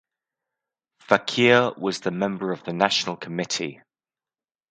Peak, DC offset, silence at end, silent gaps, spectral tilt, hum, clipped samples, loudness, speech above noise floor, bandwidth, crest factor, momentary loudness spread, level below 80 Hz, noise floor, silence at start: 0 dBFS; under 0.1%; 0.95 s; none; -4 dB/octave; none; under 0.1%; -23 LUFS; over 67 dB; 9.4 kHz; 26 dB; 11 LU; -68 dBFS; under -90 dBFS; 1.1 s